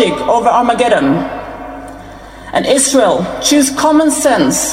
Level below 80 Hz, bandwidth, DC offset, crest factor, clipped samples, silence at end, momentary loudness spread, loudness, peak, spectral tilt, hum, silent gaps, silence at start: -40 dBFS; 16.5 kHz; under 0.1%; 12 dB; under 0.1%; 0 s; 18 LU; -11 LUFS; 0 dBFS; -3 dB/octave; none; none; 0 s